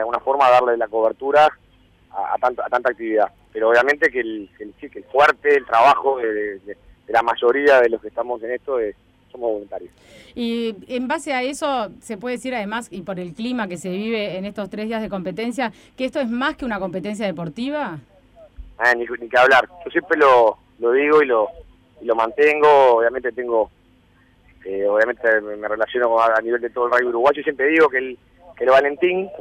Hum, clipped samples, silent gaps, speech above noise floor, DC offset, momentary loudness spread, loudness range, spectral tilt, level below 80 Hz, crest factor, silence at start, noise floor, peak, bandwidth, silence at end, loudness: none; under 0.1%; none; 36 dB; under 0.1%; 14 LU; 9 LU; -5 dB/octave; -54 dBFS; 14 dB; 0 s; -55 dBFS; -6 dBFS; 13 kHz; 0 s; -19 LUFS